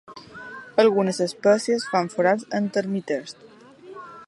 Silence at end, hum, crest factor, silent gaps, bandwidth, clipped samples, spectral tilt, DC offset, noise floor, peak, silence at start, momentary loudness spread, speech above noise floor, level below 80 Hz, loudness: 0.05 s; none; 20 dB; none; 11.5 kHz; under 0.1%; -5 dB/octave; under 0.1%; -44 dBFS; -4 dBFS; 0.1 s; 21 LU; 22 dB; -72 dBFS; -22 LUFS